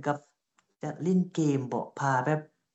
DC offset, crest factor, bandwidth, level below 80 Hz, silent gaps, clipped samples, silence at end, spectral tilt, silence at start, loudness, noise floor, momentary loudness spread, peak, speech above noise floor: under 0.1%; 18 dB; 8.2 kHz; -80 dBFS; none; under 0.1%; 0.3 s; -7 dB/octave; 0 s; -30 LUFS; -73 dBFS; 10 LU; -12 dBFS; 45 dB